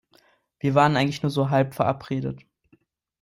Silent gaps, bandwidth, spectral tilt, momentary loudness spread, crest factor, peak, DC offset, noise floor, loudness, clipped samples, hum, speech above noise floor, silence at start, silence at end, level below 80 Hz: none; 16 kHz; -7 dB/octave; 10 LU; 20 dB; -4 dBFS; under 0.1%; -63 dBFS; -23 LUFS; under 0.1%; none; 41 dB; 0.65 s; 0.85 s; -58 dBFS